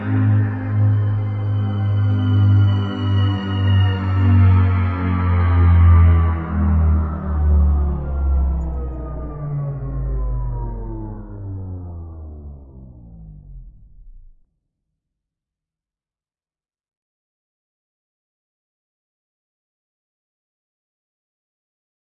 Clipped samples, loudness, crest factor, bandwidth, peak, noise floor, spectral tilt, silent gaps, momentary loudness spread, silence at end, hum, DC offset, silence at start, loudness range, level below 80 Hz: under 0.1%; -18 LUFS; 16 dB; 3.4 kHz; -4 dBFS; under -90 dBFS; -10 dB/octave; none; 18 LU; 7.9 s; none; under 0.1%; 0 s; 18 LU; -28 dBFS